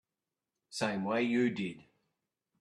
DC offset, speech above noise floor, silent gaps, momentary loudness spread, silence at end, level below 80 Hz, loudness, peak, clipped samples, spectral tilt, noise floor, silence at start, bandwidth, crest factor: under 0.1%; over 58 dB; none; 13 LU; 0.8 s; -76 dBFS; -33 LUFS; -16 dBFS; under 0.1%; -5.5 dB/octave; under -90 dBFS; 0.7 s; 12 kHz; 20 dB